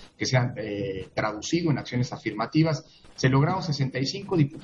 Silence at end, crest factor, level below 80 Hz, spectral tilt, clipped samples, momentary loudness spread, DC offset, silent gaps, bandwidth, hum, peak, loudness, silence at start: 0 s; 18 dB; -58 dBFS; -6 dB/octave; under 0.1%; 8 LU; under 0.1%; none; 7.8 kHz; none; -8 dBFS; -26 LUFS; 0 s